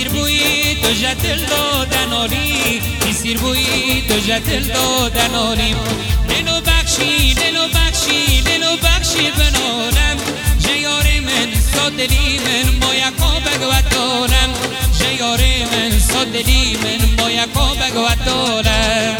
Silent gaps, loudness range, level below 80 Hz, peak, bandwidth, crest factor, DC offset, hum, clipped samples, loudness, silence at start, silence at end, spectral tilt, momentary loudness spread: none; 2 LU; -20 dBFS; 0 dBFS; 20 kHz; 14 dB; under 0.1%; none; under 0.1%; -14 LUFS; 0 s; 0 s; -3 dB/octave; 3 LU